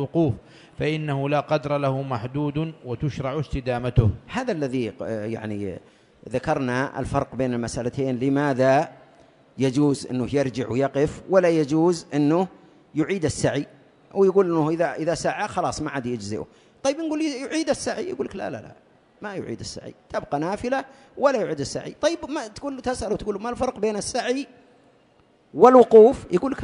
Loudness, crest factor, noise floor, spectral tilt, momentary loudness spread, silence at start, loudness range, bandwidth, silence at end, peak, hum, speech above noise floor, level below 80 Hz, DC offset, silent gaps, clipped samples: -23 LUFS; 22 dB; -59 dBFS; -6 dB/octave; 13 LU; 0 s; 6 LU; 10.5 kHz; 0 s; 0 dBFS; none; 36 dB; -46 dBFS; under 0.1%; none; under 0.1%